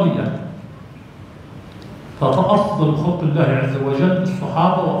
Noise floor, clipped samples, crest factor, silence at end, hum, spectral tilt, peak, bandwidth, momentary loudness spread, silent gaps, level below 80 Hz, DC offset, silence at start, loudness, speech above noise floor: -38 dBFS; under 0.1%; 16 dB; 0 s; none; -8.5 dB/octave; -4 dBFS; 10 kHz; 22 LU; none; -50 dBFS; under 0.1%; 0 s; -18 LUFS; 22 dB